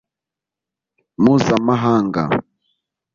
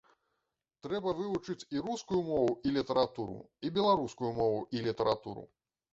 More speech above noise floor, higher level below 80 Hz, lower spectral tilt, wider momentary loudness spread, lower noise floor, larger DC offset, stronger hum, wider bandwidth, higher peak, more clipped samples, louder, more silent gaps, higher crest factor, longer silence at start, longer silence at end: first, 71 dB vs 52 dB; first, -52 dBFS vs -64 dBFS; about the same, -7 dB/octave vs -6 dB/octave; second, 7 LU vs 11 LU; about the same, -86 dBFS vs -85 dBFS; neither; neither; about the same, 7.4 kHz vs 8 kHz; first, -2 dBFS vs -14 dBFS; neither; first, -17 LUFS vs -33 LUFS; neither; about the same, 18 dB vs 20 dB; first, 1.2 s vs 0.85 s; first, 0.75 s vs 0.45 s